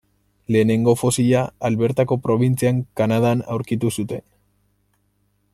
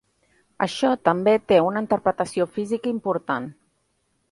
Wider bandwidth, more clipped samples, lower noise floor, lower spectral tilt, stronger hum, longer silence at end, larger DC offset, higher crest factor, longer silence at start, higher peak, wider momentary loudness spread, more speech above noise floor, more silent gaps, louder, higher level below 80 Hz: first, 14.5 kHz vs 11.5 kHz; neither; second, -66 dBFS vs -70 dBFS; about the same, -6.5 dB/octave vs -6 dB/octave; first, 50 Hz at -50 dBFS vs none; first, 1.35 s vs 0.8 s; neither; second, 16 dB vs 22 dB; about the same, 0.5 s vs 0.6 s; about the same, -4 dBFS vs -2 dBFS; about the same, 7 LU vs 9 LU; about the same, 47 dB vs 48 dB; neither; about the same, -20 LUFS vs -22 LUFS; first, -54 dBFS vs -62 dBFS